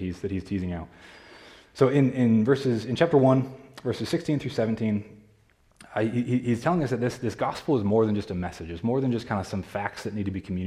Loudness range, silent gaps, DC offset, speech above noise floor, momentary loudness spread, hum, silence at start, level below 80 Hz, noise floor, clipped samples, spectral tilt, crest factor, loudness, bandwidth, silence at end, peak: 4 LU; none; under 0.1%; 36 dB; 11 LU; none; 0 s; -58 dBFS; -61 dBFS; under 0.1%; -7.5 dB/octave; 18 dB; -26 LUFS; 13 kHz; 0 s; -8 dBFS